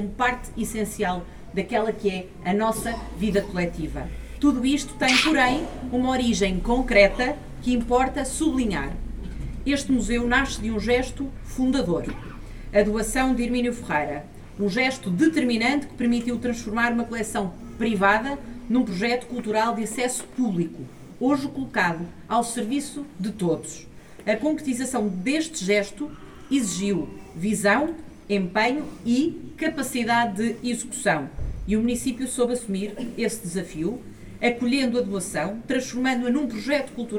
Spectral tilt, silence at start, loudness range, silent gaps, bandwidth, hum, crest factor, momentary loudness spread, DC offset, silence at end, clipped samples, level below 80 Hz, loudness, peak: -4.5 dB/octave; 0 s; 4 LU; none; 18 kHz; none; 20 dB; 11 LU; under 0.1%; 0 s; under 0.1%; -40 dBFS; -24 LUFS; -4 dBFS